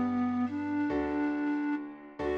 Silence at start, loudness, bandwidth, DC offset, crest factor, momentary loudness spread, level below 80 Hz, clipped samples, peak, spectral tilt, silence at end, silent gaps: 0 s; -32 LUFS; 6.2 kHz; under 0.1%; 10 dB; 7 LU; -56 dBFS; under 0.1%; -22 dBFS; -7.5 dB/octave; 0 s; none